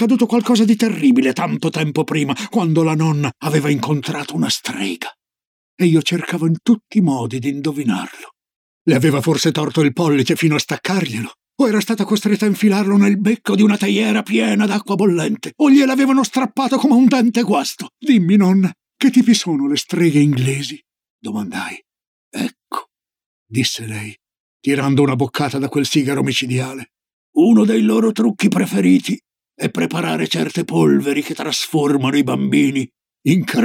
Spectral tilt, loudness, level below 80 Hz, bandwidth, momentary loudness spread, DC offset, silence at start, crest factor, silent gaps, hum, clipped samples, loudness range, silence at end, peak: -5.5 dB/octave; -16 LUFS; -68 dBFS; 16.5 kHz; 12 LU; under 0.1%; 0 s; 14 dB; 5.47-5.78 s, 8.56-8.85 s, 21.10-21.19 s, 22.07-22.31 s, 23.26-23.46 s, 24.40-24.60 s, 27.13-27.33 s; none; under 0.1%; 5 LU; 0 s; -2 dBFS